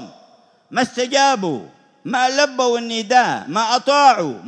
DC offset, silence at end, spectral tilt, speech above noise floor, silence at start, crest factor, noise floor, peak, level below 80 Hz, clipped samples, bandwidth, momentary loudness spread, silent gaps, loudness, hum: under 0.1%; 0 s; -3 dB/octave; 35 dB; 0 s; 18 dB; -51 dBFS; 0 dBFS; -74 dBFS; under 0.1%; 10 kHz; 11 LU; none; -17 LUFS; none